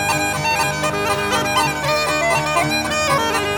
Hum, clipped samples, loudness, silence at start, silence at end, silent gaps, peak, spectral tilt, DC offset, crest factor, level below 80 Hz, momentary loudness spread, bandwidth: none; under 0.1%; -18 LUFS; 0 s; 0 s; none; -4 dBFS; -3 dB/octave; 0.1%; 14 dB; -42 dBFS; 2 LU; 20 kHz